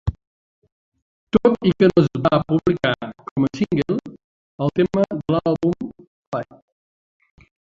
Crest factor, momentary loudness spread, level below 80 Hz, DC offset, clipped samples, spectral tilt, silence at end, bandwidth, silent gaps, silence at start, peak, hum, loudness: 20 dB; 13 LU; -44 dBFS; under 0.1%; under 0.1%; -8 dB/octave; 1.3 s; 7.6 kHz; 0.27-0.62 s, 0.72-0.92 s, 1.02-1.27 s, 3.31-3.36 s, 4.24-4.58 s, 6.07-6.32 s; 0.05 s; -2 dBFS; none; -20 LUFS